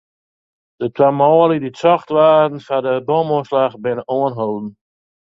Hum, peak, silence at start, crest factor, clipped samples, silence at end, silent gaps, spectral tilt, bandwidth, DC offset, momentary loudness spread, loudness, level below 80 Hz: none; 0 dBFS; 0.8 s; 16 dB; under 0.1%; 0.55 s; none; -8 dB/octave; 7.6 kHz; under 0.1%; 11 LU; -16 LUFS; -62 dBFS